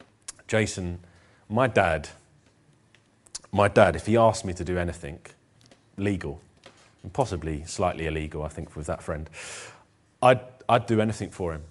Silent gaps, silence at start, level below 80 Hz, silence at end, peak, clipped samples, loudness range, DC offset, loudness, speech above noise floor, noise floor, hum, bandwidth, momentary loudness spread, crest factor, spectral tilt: none; 0.3 s; -46 dBFS; 0.05 s; -2 dBFS; under 0.1%; 7 LU; under 0.1%; -26 LUFS; 36 dB; -61 dBFS; none; 11.5 kHz; 20 LU; 26 dB; -5.5 dB/octave